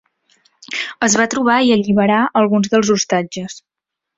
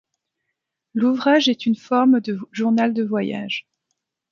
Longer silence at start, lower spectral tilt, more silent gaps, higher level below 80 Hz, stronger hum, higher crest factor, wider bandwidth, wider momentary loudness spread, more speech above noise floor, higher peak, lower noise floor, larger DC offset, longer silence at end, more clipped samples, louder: second, 0.7 s vs 0.95 s; second, -4 dB/octave vs -5.5 dB/octave; neither; first, -56 dBFS vs -72 dBFS; neither; about the same, 16 dB vs 18 dB; first, 8 kHz vs 7.2 kHz; about the same, 12 LU vs 11 LU; second, 44 dB vs 60 dB; about the same, -2 dBFS vs -4 dBFS; second, -58 dBFS vs -79 dBFS; neither; about the same, 0.6 s vs 0.7 s; neither; first, -15 LUFS vs -20 LUFS